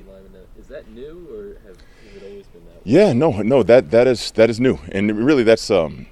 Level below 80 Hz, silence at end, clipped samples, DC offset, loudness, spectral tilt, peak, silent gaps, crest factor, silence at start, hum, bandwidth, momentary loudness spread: -44 dBFS; 0.05 s; under 0.1%; under 0.1%; -16 LUFS; -6.5 dB/octave; 0 dBFS; none; 18 dB; 0.7 s; none; 12.5 kHz; 23 LU